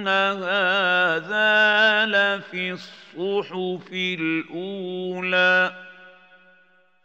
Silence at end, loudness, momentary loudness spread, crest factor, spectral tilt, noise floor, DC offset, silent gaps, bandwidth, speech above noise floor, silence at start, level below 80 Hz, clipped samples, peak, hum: 0.95 s; -21 LUFS; 14 LU; 16 dB; -4.5 dB/octave; -59 dBFS; under 0.1%; none; 8 kHz; 37 dB; 0 s; -84 dBFS; under 0.1%; -6 dBFS; none